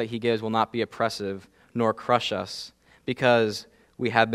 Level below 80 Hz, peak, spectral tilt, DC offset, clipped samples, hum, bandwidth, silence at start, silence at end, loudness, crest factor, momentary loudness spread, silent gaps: -66 dBFS; -2 dBFS; -5 dB/octave; under 0.1%; under 0.1%; none; 14.5 kHz; 0 s; 0 s; -26 LUFS; 24 dB; 15 LU; none